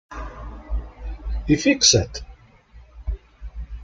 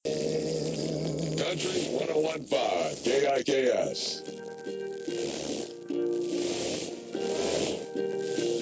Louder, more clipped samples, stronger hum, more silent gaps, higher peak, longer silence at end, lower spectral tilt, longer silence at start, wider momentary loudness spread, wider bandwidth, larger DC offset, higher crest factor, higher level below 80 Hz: first, -20 LUFS vs -30 LUFS; neither; neither; neither; first, -2 dBFS vs -14 dBFS; about the same, 0 s vs 0 s; about the same, -3 dB/octave vs -4 dB/octave; about the same, 0.1 s vs 0.05 s; first, 23 LU vs 10 LU; first, 9.6 kHz vs 8 kHz; neither; first, 22 dB vs 16 dB; first, -32 dBFS vs -62 dBFS